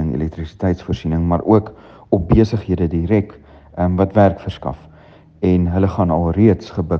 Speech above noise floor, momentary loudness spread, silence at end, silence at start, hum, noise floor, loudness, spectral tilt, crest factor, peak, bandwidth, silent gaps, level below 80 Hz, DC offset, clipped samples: 29 dB; 12 LU; 0 s; 0 s; none; -45 dBFS; -17 LUFS; -9.5 dB/octave; 16 dB; 0 dBFS; 6.8 kHz; none; -34 dBFS; under 0.1%; under 0.1%